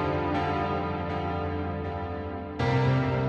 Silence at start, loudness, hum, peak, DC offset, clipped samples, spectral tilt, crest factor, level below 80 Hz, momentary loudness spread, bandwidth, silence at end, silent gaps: 0 s; -29 LUFS; none; -14 dBFS; under 0.1%; under 0.1%; -8 dB/octave; 14 dB; -44 dBFS; 9 LU; 7 kHz; 0 s; none